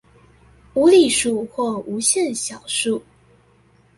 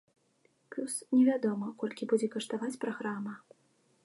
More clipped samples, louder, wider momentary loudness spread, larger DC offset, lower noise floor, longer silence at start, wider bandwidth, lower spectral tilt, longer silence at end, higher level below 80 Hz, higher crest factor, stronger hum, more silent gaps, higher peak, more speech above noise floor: neither; first, -19 LUFS vs -32 LUFS; about the same, 12 LU vs 14 LU; neither; second, -55 dBFS vs -71 dBFS; about the same, 0.75 s vs 0.7 s; about the same, 11.5 kHz vs 11.5 kHz; second, -2.5 dB/octave vs -5 dB/octave; first, 0.95 s vs 0.7 s; first, -56 dBFS vs -86 dBFS; about the same, 16 dB vs 18 dB; neither; neither; first, -4 dBFS vs -16 dBFS; about the same, 37 dB vs 40 dB